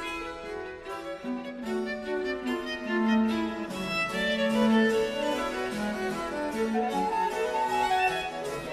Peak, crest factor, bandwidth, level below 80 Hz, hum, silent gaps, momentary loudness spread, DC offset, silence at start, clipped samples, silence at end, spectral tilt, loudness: -14 dBFS; 14 dB; 14.5 kHz; -56 dBFS; none; none; 11 LU; under 0.1%; 0 s; under 0.1%; 0 s; -4.5 dB/octave; -29 LUFS